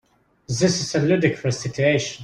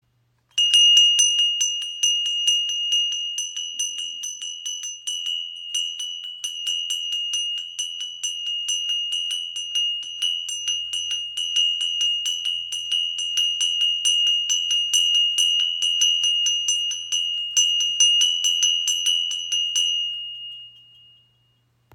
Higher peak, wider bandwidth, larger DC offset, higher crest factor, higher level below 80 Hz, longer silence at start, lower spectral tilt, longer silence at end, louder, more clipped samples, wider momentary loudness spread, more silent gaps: about the same, -4 dBFS vs -4 dBFS; second, 11.5 kHz vs 17 kHz; neither; about the same, 18 dB vs 20 dB; first, -54 dBFS vs -76 dBFS; about the same, 0.5 s vs 0.55 s; first, -5 dB/octave vs 6.5 dB/octave; second, 0 s vs 1.25 s; about the same, -21 LUFS vs -20 LUFS; neither; second, 6 LU vs 11 LU; neither